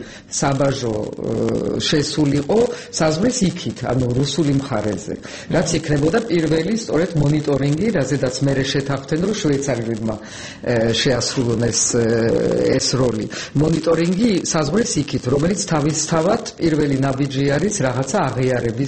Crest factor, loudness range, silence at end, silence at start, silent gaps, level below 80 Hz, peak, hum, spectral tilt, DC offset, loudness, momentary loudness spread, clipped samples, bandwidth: 14 dB; 2 LU; 0 s; 0 s; none; -42 dBFS; -4 dBFS; none; -5 dB/octave; 0.2%; -19 LUFS; 6 LU; under 0.1%; 8.8 kHz